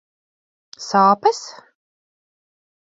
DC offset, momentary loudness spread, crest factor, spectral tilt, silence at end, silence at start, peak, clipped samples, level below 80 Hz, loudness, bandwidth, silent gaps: under 0.1%; 20 LU; 20 dB; -4.5 dB/octave; 1.45 s; 0.8 s; -2 dBFS; under 0.1%; -72 dBFS; -16 LUFS; 7.8 kHz; none